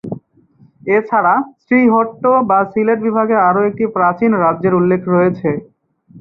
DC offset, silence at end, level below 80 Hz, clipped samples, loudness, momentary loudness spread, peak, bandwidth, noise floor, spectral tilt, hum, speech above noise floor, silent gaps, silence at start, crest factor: under 0.1%; 0 s; -58 dBFS; under 0.1%; -14 LUFS; 7 LU; -2 dBFS; 5.2 kHz; -50 dBFS; -11.5 dB/octave; none; 36 dB; none; 0.05 s; 14 dB